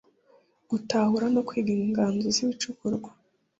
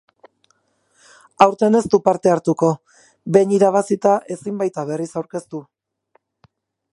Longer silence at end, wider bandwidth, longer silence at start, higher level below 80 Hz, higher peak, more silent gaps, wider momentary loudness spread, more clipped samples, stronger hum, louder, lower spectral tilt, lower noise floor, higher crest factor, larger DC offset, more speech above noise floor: second, 0.5 s vs 1.3 s; second, 8 kHz vs 11.5 kHz; second, 0.7 s vs 1.4 s; about the same, -64 dBFS vs -60 dBFS; second, -12 dBFS vs 0 dBFS; neither; second, 9 LU vs 14 LU; neither; neither; second, -27 LUFS vs -18 LUFS; second, -4.5 dB/octave vs -6.5 dB/octave; about the same, -62 dBFS vs -64 dBFS; about the same, 16 dB vs 20 dB; neither; second, 36 dB vs 47 dB